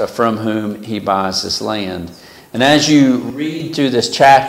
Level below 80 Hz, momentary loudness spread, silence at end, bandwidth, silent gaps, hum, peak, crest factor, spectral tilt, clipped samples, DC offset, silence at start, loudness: -52 dBFS; 13 LU; 0 s; 16 kHz; none; none; 0 dBFS; 14 dB; -4.5 dB/octave; under 0.1%; under 0.1%; 0 s; -15 LUFS